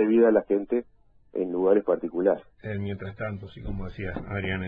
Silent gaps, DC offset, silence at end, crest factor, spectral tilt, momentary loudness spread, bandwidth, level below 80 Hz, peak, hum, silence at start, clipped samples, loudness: none; under 0.1%; 0 s; 18 dB; -10.5 dB/octave; 15 LU; 4.7 kHz; -46 dBFS; -8 dBFS; none; 0 s; under 0.1%; -27 LUFS